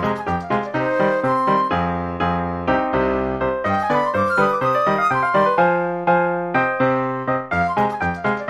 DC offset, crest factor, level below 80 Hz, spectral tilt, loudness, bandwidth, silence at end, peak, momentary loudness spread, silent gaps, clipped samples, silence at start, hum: under 0.1%; 14 dB; -44 dBFS; -7.5 dB/octave; -19 LUFS; 12.5 kHz; 0 s; -6 dBFS; 5 LU; none; under 0.1%; 0 s; none